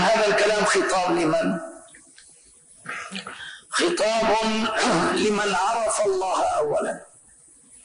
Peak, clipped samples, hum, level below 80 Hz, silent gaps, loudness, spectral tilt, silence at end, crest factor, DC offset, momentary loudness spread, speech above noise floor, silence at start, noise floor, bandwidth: -12 dBFS; under 0.1%; none; -56 dBFS; none; -22 LUFS; -3.5 dB/octave; 0.8 s; 12 dB; under 0.1%; 14 LU; 31 dB; 0 s; -53 dBFS; 11 kHz